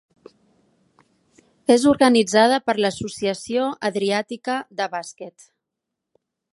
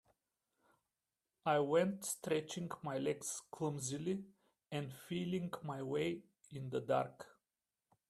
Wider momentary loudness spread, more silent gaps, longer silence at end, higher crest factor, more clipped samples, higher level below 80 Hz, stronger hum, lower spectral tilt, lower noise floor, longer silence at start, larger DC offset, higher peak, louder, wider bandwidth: about the same, 13 LU vs 11 LU; neither; first, 1.25 s vs 0.8 s; about the same, 20 dB vs 20 dB; neither; first, -60 dBFS vs -80 dBFS; neither; about the same, -4 dB/octave vs -5 dB/octave; second, -82 dBFS vs under -90 dBFS; first, 1.7 s vs 1.45 s; neither; first, -2 dBFS vs -20 dBFS; first, -20 LUFS vs -40 LUFS; second, 11.5 kHz vs 15 kHz